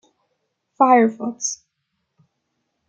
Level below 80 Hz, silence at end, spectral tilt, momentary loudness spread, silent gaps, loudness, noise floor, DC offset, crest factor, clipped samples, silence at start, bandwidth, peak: -76 dBFS; 1.35 s; -3.5 dB/octave; 12 LU; none; -18 LUFS; -75 dBFS; under 0.1%; 20 dB; under 0.1%; 0.8 s; 8.8 kHz; -2 dBFS